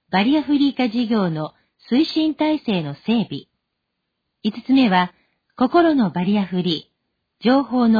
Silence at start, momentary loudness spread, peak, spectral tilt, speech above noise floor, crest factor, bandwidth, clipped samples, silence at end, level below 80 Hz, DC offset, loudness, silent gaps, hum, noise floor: 0.1 s; 11 LU; -4 dBFS; -8 dB/octave; 59 dB; 14 dB; 5 kHz; under 0.1%; 0 s; -58 dBFS; under 0.1%; -19 LUFS; none; none; -77 dBFS